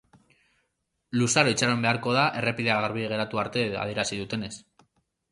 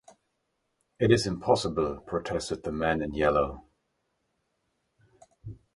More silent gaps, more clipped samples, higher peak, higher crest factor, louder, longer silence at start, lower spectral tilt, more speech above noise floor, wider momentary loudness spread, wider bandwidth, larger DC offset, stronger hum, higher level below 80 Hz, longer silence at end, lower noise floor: neither; neither; first, -4 dBFS vs -8 dBFS; about the same, 22 dB vs 24 dB; first, -25 LUFS vs -28 LUFS; about the same, 1.1 s vs 1 s; second, -4 dB/octave vs -5.5 dB/octave; about the same, 51 dB vs 51 dB; second, 11 LU vs 21 LU; about the same, 11.5 kHz vs 11.5 kHz; neither; neither; second, -60 dBFS vs -50 dBFS; first, 0.7 s vs 0.2 s; about the same, -77 dBFS vs -78 dBFS